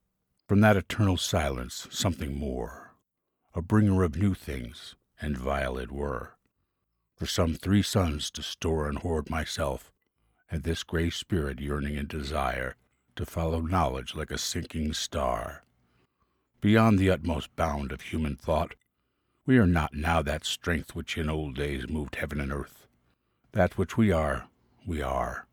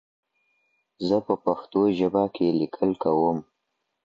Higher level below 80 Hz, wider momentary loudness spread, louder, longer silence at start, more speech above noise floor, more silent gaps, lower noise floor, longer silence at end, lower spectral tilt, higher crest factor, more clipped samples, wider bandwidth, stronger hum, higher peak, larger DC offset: first, -40 dBFS vs -62 dBFS; first, 14 LU vs 4 LU; second, -29 LUFS vs -25 LUFS; second, 0.5 s vs 1 s; about the same, 52 dB vs 55 dB; neither; about the same, -80 dBFS vs -78 dBFS; second, 0.1 s vs 0.65 s; second, -5.5 dB/octave vs -8.5 dB/octave; about the same, 22 dB vs 18 dB; neither; first, 18 kHz vs 7.6 kHz; neither; about the same, -8 dBFS vs -8 dBFS; neither